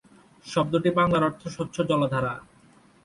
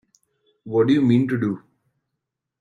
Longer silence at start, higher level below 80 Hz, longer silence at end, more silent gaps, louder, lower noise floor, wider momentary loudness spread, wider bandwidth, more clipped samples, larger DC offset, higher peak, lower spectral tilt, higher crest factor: second, 0.45 s vs 0.65 s; first, -56 dBFS vs -62 dBFS; second, 0.65 s vs 1.05 s; neither; second, -25 LUFS vs -20 LUFS; second, -56 dBFS vs -82 dBFS; about the same, 11 LU vs 10 LU; first, 11.5 kHz vs 7.6 kHz; neither; neither; second, -10 dBFS vs -6 dBFS; second, -6.5 dB/octave vs -8.5 dB/octave; about the same, 18 dB vs 16 dB